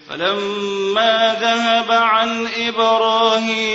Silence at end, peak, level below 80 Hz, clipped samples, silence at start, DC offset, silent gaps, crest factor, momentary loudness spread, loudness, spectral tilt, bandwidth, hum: 0 s; -2 dBFS; -60 dBFS; under 0.1%; 0.1 s; under 0.1%; none; 14 dB; 6 LU; -16 LUFS; -3 dB/octave; 8 kHz; none